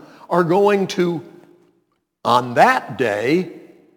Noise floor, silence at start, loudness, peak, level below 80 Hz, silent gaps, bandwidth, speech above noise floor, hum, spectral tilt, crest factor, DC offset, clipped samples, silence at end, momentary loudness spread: -67 dBFS; 0.3 s; -18 LUFS; 0 dBFS; -68 dBFS; none; 19 kHz; 50 dB; none; -6 dB/octave; 20 dB; under 0.1%; under 0.1%; 0.4 s; 9 LU